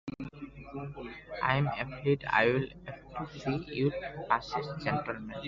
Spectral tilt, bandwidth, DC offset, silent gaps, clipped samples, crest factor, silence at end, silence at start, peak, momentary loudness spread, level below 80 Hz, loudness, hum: -4.5 dB/octave; 7.4 kHz; under 0.1%; none; under 0.1%; 24 dB; 0 s; 0.05 s; -10 dBFS; 16 LU; -56 dBFS; -32 LUFS; none